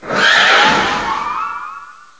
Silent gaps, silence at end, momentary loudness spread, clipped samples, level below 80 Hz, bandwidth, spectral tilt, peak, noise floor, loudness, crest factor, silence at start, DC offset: none; 0.25 s; 17 LU; under 0.1%; -46 dBFS; 8 kHz; -2 dB/octave; 0 dBFS; -34 dBFS; -12 LUFS; 14 dB; 0 s; 0.4%